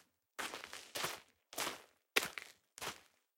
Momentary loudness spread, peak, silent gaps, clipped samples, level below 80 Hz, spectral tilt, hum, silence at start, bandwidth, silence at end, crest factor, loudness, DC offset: 17 LU; -10 dBFS; none; under 0.1%; -80 dBFS; -0.5 dB/octave; none; 0.4 s; 16.5 kHz; 0.35 s; 36 dB; -42 LUFS; under 0.1%